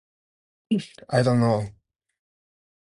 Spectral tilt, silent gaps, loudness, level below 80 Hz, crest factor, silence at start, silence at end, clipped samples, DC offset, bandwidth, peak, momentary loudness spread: -7 dB/octave; none; -24 LUFS; -58 dBFS; 20 dB; 0.7 s; 1.25 s; under 0.1%; under 0.1%; 11 kHz; -6 dBFS; 8 LU